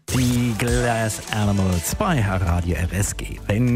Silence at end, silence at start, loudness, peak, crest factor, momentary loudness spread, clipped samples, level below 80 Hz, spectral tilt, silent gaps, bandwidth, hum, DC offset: 0 s; 0.1 s; -22 LUFS; -4 dBFS; 16 dB; 4 LU; under 0.1%; -34 dBFS; -5.5 dB/octave; none; 16 kHz; none; under 0.1%